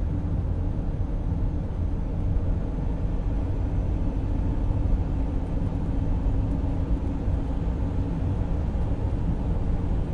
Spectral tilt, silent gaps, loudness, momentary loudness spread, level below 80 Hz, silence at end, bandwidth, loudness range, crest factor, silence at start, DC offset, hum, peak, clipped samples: -10 dB/octave; none; -28 LUFS; 2 LU; -28 dBFS; 0 s; 4.8 kHz; 1 LU; 12 dB; 0 s; under 0.1%; none; -12 dBFS; under 0.1%